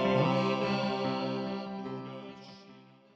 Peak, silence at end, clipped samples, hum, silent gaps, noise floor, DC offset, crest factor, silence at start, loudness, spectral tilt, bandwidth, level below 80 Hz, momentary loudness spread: -16 dBFS; 0.35 s; under 0.1%; none; none; -56 dBFS; under 0.1%; 16 dB; 0 s; -32 LUFS; -7 dB/octave; 8 kHz; -68 dBFS; 21 LU